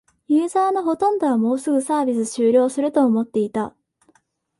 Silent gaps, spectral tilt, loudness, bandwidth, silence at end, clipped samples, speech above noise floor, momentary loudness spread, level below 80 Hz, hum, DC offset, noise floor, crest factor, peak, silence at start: none; -6 dB/octave; -20 LUFS; 11.5 kHz; 0.9 s; under 0.1%; 43 dB; 5 LU; -66 dBFS; none; under 0.1%; -62 dBFS; 14 dB; -6 dBFS; 0.3 s